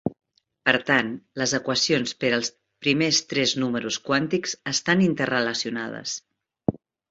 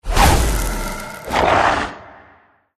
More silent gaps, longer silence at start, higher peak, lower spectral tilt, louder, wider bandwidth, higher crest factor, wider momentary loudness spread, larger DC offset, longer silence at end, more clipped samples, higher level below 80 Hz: neither; about the same, 0.05 s vs 0.05 s; second, -4 dBFS vs 0 dBFS; about the same, -3.5 dB/octave vs -4 dB/octave; second, -24 LUFS vs -17 LUFS; second, 8 kHz vs 14 kHz; about the same, 20 dB vs 18 dB; second, 10 LU vs 14 LU; neither; second, 0.35 s vs 0.7 s; neither; second, -60 dBFS vs -24 dBFS